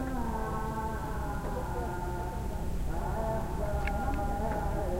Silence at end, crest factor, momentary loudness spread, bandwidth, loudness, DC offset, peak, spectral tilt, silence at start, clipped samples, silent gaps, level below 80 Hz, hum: 0 s; 14 dB; 3 LU; 16 kHz; -35 LUFS; under 0.1%; -18 dBFS; -7 dB/octave; 0 s; under 0.1%; none; -36 dBFS; none